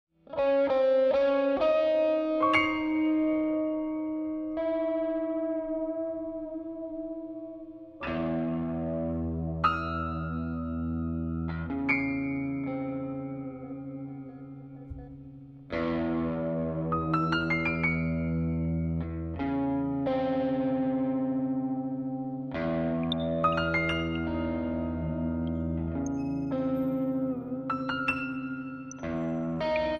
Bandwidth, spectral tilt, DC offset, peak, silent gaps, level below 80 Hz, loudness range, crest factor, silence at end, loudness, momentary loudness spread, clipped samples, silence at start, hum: 6.8 kHz; -7.5 dB/octave; under 0.1%; -12 dBFS; none; -48 dBFS; 8 LU; 18 dB; 0 s; -30 LUFS; 13 LU; under 0.1%; 0.3 s; none